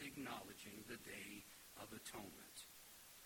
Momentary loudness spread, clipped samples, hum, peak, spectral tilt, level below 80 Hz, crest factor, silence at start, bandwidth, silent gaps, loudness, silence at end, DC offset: 8 LU; under 0.1%; none; -34 dBFS; -3 dB/octave; -78 dBFS; 20 dB; 0 s; 17.5 kHz; none; -54 LUFS; 0 s; under 0.1%